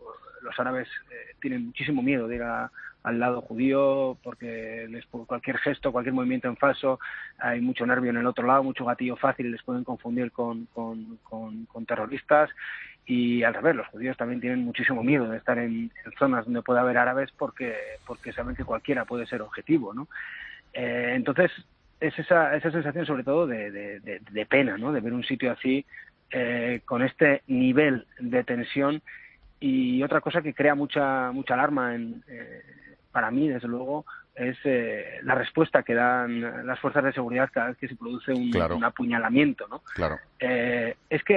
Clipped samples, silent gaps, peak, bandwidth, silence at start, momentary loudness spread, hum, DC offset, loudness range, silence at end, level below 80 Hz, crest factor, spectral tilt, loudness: under 0.1%; none; -4 dBFS; 5.2 kHz; 0 s; 14 LU; none; under 0.1%; 4 LU; 0 s; -56 dBFS; 22 dB; -8.5 dB/octave; -27 LUFS